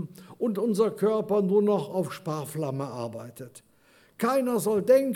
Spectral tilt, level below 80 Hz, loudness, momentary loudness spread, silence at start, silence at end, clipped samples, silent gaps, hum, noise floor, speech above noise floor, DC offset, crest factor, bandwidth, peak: -6.5 dB/octave; -74 dBFS; -27 LUFS; 17 LU; 0 s; 0 s; under 0.1%; none; none; -60 dBFS; 35 dB; under 0.1%; 16 dB; 17.5 kHz; -10 dBFS